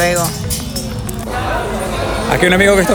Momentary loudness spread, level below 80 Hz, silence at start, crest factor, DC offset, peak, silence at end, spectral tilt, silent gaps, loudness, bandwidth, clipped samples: 12 LU; -28 dBFS; 0 s; 14 dB; under 0.1%; 0 dBFS; 0 s; -4 dB/octave; none; -16 LUFS; over 20 kHz; under 0.1%